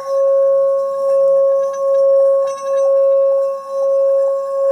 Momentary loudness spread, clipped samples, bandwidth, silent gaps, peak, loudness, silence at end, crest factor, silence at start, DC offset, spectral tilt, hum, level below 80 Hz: 5 LU; under 0.1%; 8.8 kHz; none; -8 dBFS; -14 LUFS; 0 s; 6 dB; 0 s; under 0.1%; -3 dB/octave; none; -78 dBFS